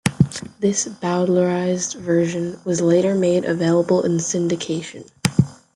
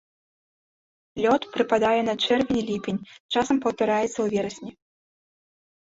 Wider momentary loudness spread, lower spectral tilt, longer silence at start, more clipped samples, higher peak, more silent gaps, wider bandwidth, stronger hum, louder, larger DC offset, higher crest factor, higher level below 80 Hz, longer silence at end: second, 7 LU vs 11 LU; about the same, -5.5 dB/octave vs -4.5 dB/octave; second, 0.05 s vs 1.15 s; neither; first, 0 dBFS vs -8 dBFS; second, none vs 3.20-3.29 s; first, 12 kHz vs 8 kHz; neither; first, -20 LUFS vs -24 LUFS; neither; about the same, 20 dB vs 18 dB; first, -54 dBFS vs -60 dBFS; second, 0.2 s vs 1.25 s